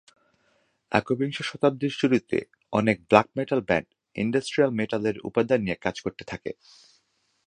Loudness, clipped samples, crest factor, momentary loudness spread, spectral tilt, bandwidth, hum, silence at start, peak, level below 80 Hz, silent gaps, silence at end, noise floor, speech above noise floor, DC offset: -25 LUFS; under 0.1%; 26 dB; 14 LU; -6 dB/octave; 10.5 kHz; none; 0.9 s; 0 dBFS; -58 dBFS; none; 0.95 s; -69 dBFS; 45 dB; under 0.1%